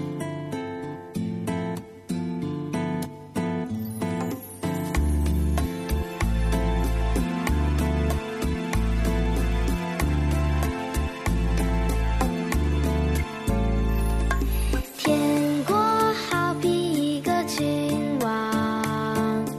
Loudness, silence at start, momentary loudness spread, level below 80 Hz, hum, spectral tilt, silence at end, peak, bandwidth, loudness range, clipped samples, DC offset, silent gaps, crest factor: -26 LUFS; 0 s; 8 LU; -28 dBFS; none; -6 dB/octave; 0 s; -10 dBFS; 14 kHz; 6 LU; under 0.1%; under 0.1%; none; 16 dB